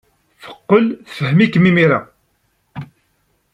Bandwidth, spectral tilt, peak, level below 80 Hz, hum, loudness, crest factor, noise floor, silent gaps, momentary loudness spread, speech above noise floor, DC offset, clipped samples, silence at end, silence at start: 8.8 kHz; -8 dB/octave; -2 dBFS; -56 dBFS; none; -14 LUFS; 16 dB; -64 dBFS; none; 22 LU; 50 dB; under 0.1%; under 0.1%; 0.7 s; 0.45 s